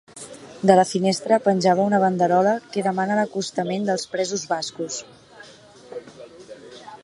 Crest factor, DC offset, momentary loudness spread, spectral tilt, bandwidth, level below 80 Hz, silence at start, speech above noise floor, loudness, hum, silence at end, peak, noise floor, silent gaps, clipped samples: 22 dB; under 0.1%; 22 LU; -5 dB/octave; 11.5 kHz; -68 dBFS; 0.15 s; 26 dB; -21 LUFS; none; 0.1 s; 0 dBFS; -47 dBFS; none; under 0.1%